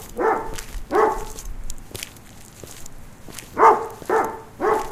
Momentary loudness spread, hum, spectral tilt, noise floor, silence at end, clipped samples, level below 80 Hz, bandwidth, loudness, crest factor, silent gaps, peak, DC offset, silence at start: 24 LU; none; -4 dB/octave; -42 dBFS; 0 s; under 0.1%; -38 dBFS; 16 kHz; -21 LUFS; 22 dB; none; -2 dBFS; under 0.1%; 0 s